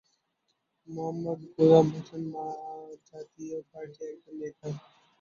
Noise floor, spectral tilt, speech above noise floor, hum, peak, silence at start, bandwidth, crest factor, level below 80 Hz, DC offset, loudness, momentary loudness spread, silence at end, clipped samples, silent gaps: -78 dBFS; -8.5 dB/octave; 49 dB; none; -6 dBFS; 0.9 s; 7 kHz; 24 dB; -72 dBFS; under 0.1%; -28 LUFS; 24 LU; 0.4 s; under 0.1%; none